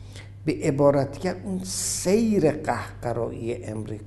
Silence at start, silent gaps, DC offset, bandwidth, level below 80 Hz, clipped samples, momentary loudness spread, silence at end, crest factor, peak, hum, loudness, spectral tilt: 0 s; none; under 0.1%; 12.5 kHz; -48 dBFS; under 0.1%; 11 LU; 0 s; 20 dB; -6 dBFS; none; -25 LUFS; -5.5 dB/octave